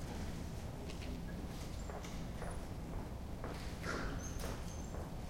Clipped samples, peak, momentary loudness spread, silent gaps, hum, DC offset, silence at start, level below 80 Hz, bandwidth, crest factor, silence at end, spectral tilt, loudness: under 0.1%; -28 dBFS; 4 LU; none; none; under 0.1%; 0 s; -48 dBFS; 16.5 kHz; 14 dB; 0 s; -5.5 dB/octave; -46 LUFS